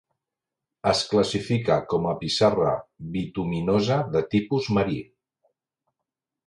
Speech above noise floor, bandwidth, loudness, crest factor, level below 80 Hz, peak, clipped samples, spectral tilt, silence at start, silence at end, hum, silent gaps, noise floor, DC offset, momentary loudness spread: 63 dB; 11.5 kHz; -24 LUFS; 20 dB; -52 dBFS; -6 dBFS; under 0.1%; -6 dB/octave; 0.85 s; 1.45 s; none; none; -87 dBFS; under 0.1%; 8 LU